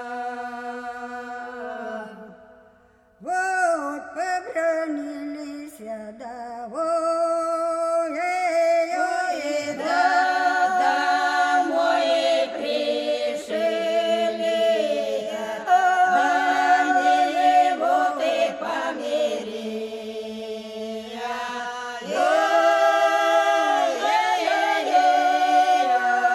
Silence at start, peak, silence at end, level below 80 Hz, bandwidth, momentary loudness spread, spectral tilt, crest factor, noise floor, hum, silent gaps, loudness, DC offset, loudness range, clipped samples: 0 s; -6 dBFS; 0 s; -68 dBFS; 13 kHz; 14 LU; -2.5 dB/octave; 16 dB; -56 dBFS; none; none; -22 LUFS; under 0.1%; 9 LU; under 0.1%